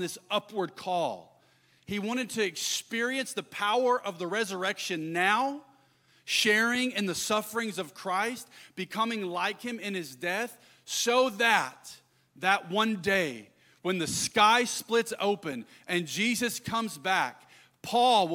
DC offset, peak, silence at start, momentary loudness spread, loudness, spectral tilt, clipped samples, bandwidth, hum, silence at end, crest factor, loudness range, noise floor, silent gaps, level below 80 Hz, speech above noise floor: under 0.1%; -10 dBFS; 0 s; 13 LU; -29 LUFS; -2.5 dB/octave; under 0.1%; 17.5 kHz; none; 0 s; 20 dB; 4 LU; -65 dBFS; none; -72 dBFS; 35 dB